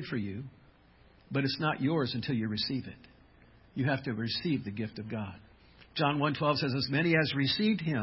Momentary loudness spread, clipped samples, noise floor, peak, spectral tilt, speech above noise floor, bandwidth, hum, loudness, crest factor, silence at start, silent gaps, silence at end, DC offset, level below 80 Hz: 13 LU; under 0.1%; -61 dBFS; -12 dBFS; -9.5 dB/octave; 29 dB; 5.8 kHz; none; -31 LUFS; 20 dB; 0 s; none; 0 s; under 0.1%; -60 dBFS